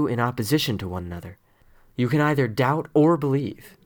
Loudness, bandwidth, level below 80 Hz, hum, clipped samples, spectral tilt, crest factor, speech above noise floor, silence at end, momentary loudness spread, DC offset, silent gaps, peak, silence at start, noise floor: -23 LUFS; over 20 kHz; -54 dBFS; none; under 0.1%; -6.5 dB/octave; 16 dB; 32 dB; 0.15 s; 16 LU; under 0.1%; none; -8 dBFS; 0 s; -55 dBFS